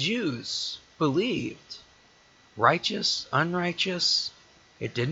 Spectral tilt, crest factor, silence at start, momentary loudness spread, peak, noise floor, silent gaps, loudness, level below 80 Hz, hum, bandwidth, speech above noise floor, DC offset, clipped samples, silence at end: -4 dB/octave; 24 dB; 0 s; 14 LU; -4 dBFS; -58 dBFS; none; -26 LUFS; -64 dBFS; none; 8.2 kHz; 31 dB; under 0.1%; under 0.1%; 0 s